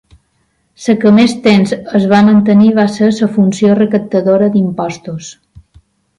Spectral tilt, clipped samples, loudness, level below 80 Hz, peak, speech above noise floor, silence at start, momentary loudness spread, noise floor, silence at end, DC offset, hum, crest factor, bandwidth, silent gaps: -7 dB/octave; under 0.1%; -10 LUFS; -50 dBFS; 0 dBFS; 50 dB; 0.8 s; 13 LU; -60 dBFS; 0.85 s; under 0.1%; none; 10 dB; 11 kHz; none